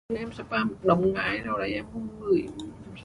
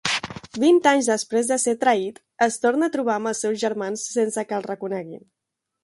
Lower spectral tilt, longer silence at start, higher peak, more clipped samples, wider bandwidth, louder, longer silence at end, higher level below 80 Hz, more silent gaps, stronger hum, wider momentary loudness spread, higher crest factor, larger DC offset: first, -7 dB/octave vs -3 dB/octave; about the same, 0.1 s vs 0.05 s; second, -8 dBFS vs -4 dBFS; neither; about the same, 11 kHz vs 11.5 kHz; second, -27 LUFS vs -22 LUFS; second, 0 s vs 0.65 s; first, -52 dBFS vs -64 dBFS; neither; neither; first, 14 LU vs 11 LU; about the same, 20 dB vs 18 dB; neither